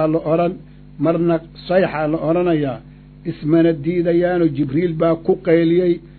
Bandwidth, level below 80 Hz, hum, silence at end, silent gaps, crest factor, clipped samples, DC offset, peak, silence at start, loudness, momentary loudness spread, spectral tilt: 4.5 kHz; -46 dBFS; none; 0.05 s; none; 16 dB; under 0.1%; under 0.1%; -2 dBFS; 0 s; -18 LUFS; 9 LU; -12.5 dB/octave